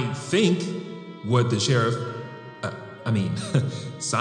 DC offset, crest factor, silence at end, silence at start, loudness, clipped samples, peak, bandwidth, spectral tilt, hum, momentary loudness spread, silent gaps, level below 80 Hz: under 0.1%; 18 dB; 0 s; 0 s; -25 LUFS; under 0.1%; -6 dBFS; 10.5 kHz; -5.5 dB/octave; none; 13 LU; none; -66 dBFS